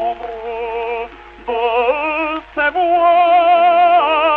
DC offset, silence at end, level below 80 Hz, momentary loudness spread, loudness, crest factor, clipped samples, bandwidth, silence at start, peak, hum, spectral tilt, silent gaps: under 0.1%; 0 s; -48 dBFS; 15 LU; -14 LUFS; 12 dB; under 0.1%; 4.4 kHz; 0 s; -2 dBFS; none; -5.5 dB/octave; none